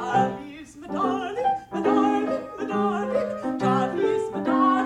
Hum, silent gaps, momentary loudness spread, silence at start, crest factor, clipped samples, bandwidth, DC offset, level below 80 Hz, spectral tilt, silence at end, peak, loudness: none; none; 8 LU; 0 s; 14 dB; under 0.1%; 10.5 kHz; under 0.1%; -60 dBFS; -6.5 dB/octave; 0 s; -10 dBFS; -24 LUFS